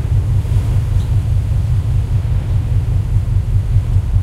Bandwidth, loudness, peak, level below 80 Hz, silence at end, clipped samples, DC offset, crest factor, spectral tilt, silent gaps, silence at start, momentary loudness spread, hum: 11 kHz; -17 LUFS; -2 dBFS; -18 dBFS; 0 s; under 0.1%; under 0.1%; 12 dB; -8 dB/octave; none; 0 s; 1 LU; none